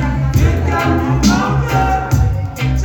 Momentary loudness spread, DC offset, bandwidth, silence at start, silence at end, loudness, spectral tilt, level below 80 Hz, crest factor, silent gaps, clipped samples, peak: 4 LU; under 0.1%; 17 kHz; 0 s; 0 s; -15 LUFS; -6 dB/octave; -22 dBFS; 14 dB; none; under 0.1%; 0 dBFS